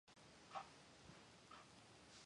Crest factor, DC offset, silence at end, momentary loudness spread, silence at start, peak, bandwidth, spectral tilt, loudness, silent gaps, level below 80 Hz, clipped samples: 24 dB; under 0.1%; 0 s; 9 LU; 0.05 s; -38 dBFS; 11 kHz; -3 dB/octave; -61 LUFS; none; -82 dBFS; under 0.1%